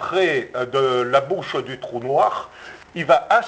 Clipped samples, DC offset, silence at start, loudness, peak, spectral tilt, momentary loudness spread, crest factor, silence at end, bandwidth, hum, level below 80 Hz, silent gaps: under 0.1%; under 0.1%; 0 s; -20 LUFS; -2 dBFS; -5 dB/octave; 12 LU; 18 dB; 0 s; 8 kHz; none; -60 dBFS; none